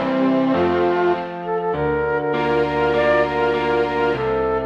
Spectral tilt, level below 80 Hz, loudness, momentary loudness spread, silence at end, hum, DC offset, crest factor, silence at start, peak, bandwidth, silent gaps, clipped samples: -7.5 dB/octave; -42 dBFS; -19 LUFS; 4 LU; 0 s; none; under 0.1%; 12 dB; 0 s; -6 dBFS; 7.4 kHz; none; under 0.1%